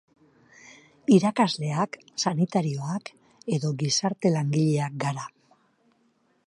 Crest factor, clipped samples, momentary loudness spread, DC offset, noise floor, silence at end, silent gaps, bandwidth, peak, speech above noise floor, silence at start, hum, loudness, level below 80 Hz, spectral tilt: 20 dB; under 0.1%; 13 LU; under 0.1%; -67 dBFS; 1.2 s; none; 11.5 kHz; -6 dBFS; 43 dB; 0.65 s; none; -25 LUFS; -72 dBFS; -5.5 dB/octave